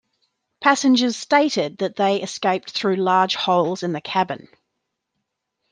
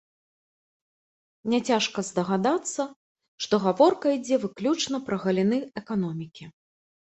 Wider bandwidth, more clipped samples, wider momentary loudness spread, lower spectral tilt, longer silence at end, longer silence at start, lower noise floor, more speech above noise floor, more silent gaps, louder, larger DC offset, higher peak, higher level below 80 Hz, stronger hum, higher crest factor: first, 10 kHz vs 8.4 kHz; neither; second, 6 LU vs 12 LU; about the same, -4 dB/octave vs -5 dB/octave; first, 1.35 s vs 0.55 s; second, 0.6 s vs 1.45 s; second, -78 dBFS vs under -90 dBFS; second, 58 dB vs over 65 dB; second, none vs 2.96-3.15 s, 3.28-3.38 s; first, -20 LUFS vs -26 LUFS; neither; first, -2 dBFS vs -6 dBFS; about the same, -72 dBFS vs -68 dBFS; neither; about the same, 18 dB vs 20 dB